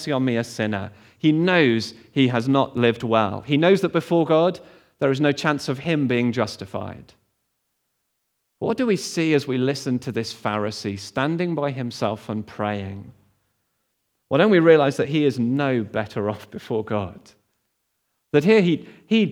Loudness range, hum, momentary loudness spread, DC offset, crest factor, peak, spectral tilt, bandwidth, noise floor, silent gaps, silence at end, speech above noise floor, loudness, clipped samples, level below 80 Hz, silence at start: 7 LU; none; 12 LU; under 0.1%; 20 dB; -2 dBFS; -6 dB/octave; 15.5 kHz; -74 dBFS; none; 0 s; 53 dB; -21 LUFS; under 0.1%; -66 dBFS; 0 s